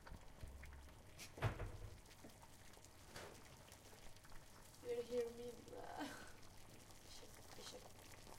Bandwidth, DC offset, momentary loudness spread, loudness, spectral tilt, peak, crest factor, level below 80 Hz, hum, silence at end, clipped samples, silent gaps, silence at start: 16 kHz; under 0.1%; 16 LU; -54 LUFS; -4.5 dB/octave; -30 dBFS; 24 dB; -62 dBFS; none; 0 s; under 0.1%; none; 0 s